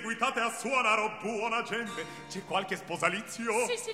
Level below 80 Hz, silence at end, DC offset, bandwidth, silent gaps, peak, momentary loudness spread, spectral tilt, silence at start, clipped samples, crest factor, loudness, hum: -72 dBFS; 0 s; under 0.1%; 16 kHz; none; -10 dBFS; 10 LU; -2.5 dB/octave; 0 s; under 0.1%; 20 dB; -31 LUFS; none